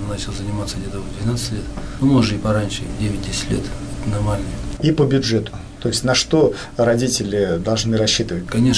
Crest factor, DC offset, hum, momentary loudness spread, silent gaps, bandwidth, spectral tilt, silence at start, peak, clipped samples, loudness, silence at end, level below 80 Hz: 14 dB; under 0.1%; none; 10 LU; none; 11 kHz; -5 dB/octave; 0 s; -6 dBFS; under 0.1%; -20 LUFS; 0 s; -32 dBFS